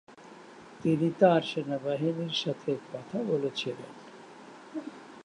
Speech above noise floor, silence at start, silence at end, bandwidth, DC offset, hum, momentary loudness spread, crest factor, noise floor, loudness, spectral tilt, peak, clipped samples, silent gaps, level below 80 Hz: 21 dB; 0.1 s; 0 s; 10.5 kHz; under 0.1%; none; 25 LU; 24 dB; -50 dBFS; -29 LUFS; -6.5 dB/octave; -8 dBFS; under 0.1%; none; -76 dBFS